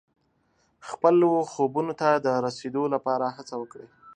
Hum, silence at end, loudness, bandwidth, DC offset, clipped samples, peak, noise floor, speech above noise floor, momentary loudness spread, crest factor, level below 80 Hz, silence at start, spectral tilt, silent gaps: none; 0.05 s; -25 LUFS; 9.6 kHz; under 0.1%; under 0.1%; -6 dBFS; -69 dBFS; 44 dB; 16 LU; 20 dB; -74 dBFS; 0.85 s; -6.5 dB/octave; none